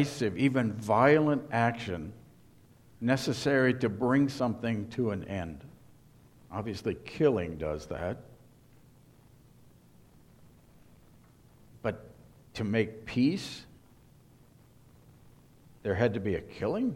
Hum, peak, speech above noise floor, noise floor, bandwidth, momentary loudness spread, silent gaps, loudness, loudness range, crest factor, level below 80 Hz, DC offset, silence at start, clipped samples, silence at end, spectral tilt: none; -8 dBFS; 29 dB; -59 dBFS; 15.5 kHz; 14 LU; none; -30 LUFS; 14 LU; 24 dB; -58 dBFS; under 0.1%; 0 s; under 0.1%; 0 s; -6.5 dB/octave